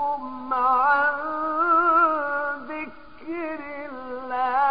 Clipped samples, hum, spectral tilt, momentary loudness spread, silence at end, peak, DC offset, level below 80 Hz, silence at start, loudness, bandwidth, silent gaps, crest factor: under 0.1%; none; -8 dB/octave; 16 LU; 0 s; -8 dBFS; 0.5%; -60 dBFS; 0 s; -22 LUFS; 5.2 kHz; none; 14 dB